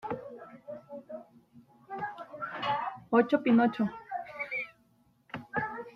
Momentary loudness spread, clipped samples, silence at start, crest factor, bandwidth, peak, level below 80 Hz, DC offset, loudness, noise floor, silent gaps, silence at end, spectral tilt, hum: 21 LU; under 0.1%; 0.05 s; 22 dB; 5.8 kHz; -10 dBFS; -72 dBFS; under 0.1%; -31 LUFS; -67 dBFS; none; 0.05 s; -7.5 dB/octave; none